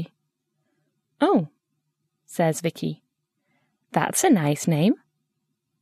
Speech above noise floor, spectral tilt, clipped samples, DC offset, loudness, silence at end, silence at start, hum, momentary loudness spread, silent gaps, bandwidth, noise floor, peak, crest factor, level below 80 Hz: 56 dB; -5.5 dB/octave; under 0.1%; under 0.1%; -23 LUFS; 0.85 s; 0 s; none; 16 LU; none; 14 kHz; -78 dBFS; -6 dBFS; 20 dB; -70 dBFS